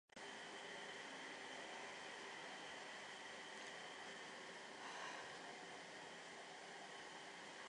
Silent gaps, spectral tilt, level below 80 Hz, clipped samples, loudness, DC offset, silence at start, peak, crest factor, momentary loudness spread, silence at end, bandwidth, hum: none; -1.5 dB/octave; under -90 dBFS; under 0.1%; -53 LUFS; under 0.1%; 0.15 s; -40 dBFS; 14 dB; 3 LU; 0 s; 11 kHz; none